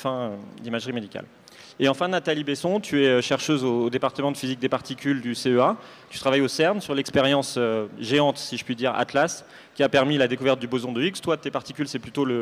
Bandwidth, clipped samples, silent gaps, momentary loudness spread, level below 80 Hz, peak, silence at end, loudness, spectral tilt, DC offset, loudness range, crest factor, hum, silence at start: 15.5 kHz; under 0.1%; none; 10 LU; -64 dBFS; -8 dBFS; 0 s; -24 LUFS; -5 dB/octave; under 0.1%; 1 LU; 16 dB; none; 0 s